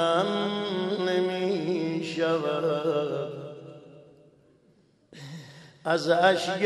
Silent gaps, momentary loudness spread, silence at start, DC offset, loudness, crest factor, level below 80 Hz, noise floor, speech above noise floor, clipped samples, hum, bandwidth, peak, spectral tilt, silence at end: none; 21 LU; 0 s; under 0.1%; -27 LUFS; 18 dB; -76 dBFS; -62 dBFS; 38 dB; under 0.1%; none; 12.5 kHz; -10 dBFS; -5.5 dB/octave; 0 s